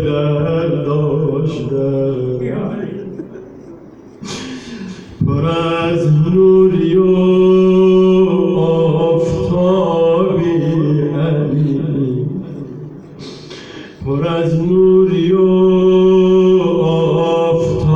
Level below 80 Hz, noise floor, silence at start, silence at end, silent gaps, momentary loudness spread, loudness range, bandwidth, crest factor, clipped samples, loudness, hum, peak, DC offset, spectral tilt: -40 dBFS; -37 dBFS; 0 s; 0 s; none; 19 LU; 10 LU; 7.6 kHz; 12 dB; under 0.1%; -13 LUFS; none; -2 dBFS; under 0.1%; -8.5 dB/octave